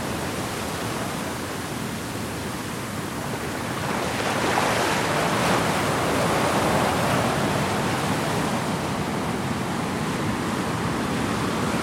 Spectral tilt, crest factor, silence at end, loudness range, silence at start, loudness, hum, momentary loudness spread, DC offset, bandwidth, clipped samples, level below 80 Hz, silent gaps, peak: -4.5 dB/octave; 16 dB; 0 s; 7 LU; 0 s; -25 LUFS; none; 8 LU; under 0.1%; 16.5 kHz; under 0.1%; -48 dBFS; none; -8 dBFS